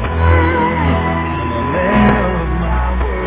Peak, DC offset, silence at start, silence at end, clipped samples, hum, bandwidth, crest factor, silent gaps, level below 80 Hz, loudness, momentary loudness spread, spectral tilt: 0 dBFS; under 0.1%; 0 s; 0 s; under 0.1%; none; 4 kHz; 14 dB; none; -20 dBFS; -15 LUFS; 6 LU; -11 dB/octave